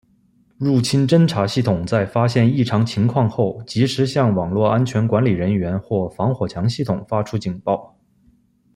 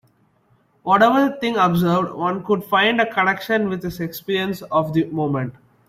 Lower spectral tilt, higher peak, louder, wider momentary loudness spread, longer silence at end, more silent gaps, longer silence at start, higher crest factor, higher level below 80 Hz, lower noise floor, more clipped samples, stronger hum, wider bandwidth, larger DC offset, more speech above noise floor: about the same, -7 dB/octave vs -6.5 dB/octave; about the same, -2 dBFS vs -2 dBFS; about the same, -19 LUFS vs -19 LUFS; second, 7 LU vs 10 LU; first, 0.9 s vs 0.4 s; neither; second, 0.6 s vs 0.85 s; about the same, 16 dB vs 18 dB; about the same, -52 dBFS vs -56 dBFS; about the same, -58 dBFS vs -60 dBFS; neither; neither; second, 12 kHz vs 16 kHz; neither; about the same, 40 dB vs 41 dB